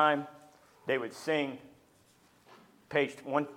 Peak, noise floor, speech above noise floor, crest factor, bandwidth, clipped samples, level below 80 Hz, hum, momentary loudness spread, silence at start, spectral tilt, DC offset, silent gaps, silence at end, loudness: -12 dBFS; -65 dBFS; 33 dB; 22 dB; 16 kHz; under 0.1%; -80 dBFS; none; 13 LU; 0 s; -5 dB/octave; under 0.1%; none; 0 s; -33 LUFS